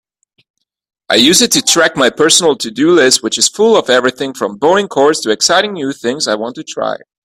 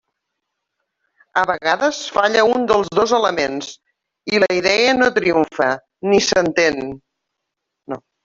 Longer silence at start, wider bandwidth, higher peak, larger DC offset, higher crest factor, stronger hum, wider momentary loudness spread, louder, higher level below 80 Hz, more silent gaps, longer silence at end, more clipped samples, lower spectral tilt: second, 1.1 s vs 1.35 s; first, over 20 kHz vs 7.8 kHz; about the same, 0 dBFS vs -2 dBFS; neither; second, 12 dB vs 18 dB; neither; second, 11 LU vs 14 LU; first, -11 LUFS vs -17 LUFS; about the same, -54 dBFS vs -54 dBFS; neither; about the same, 0.3 s vs 0.25 s; neither; second, -2 dB/octave vs -3.5 dB/octave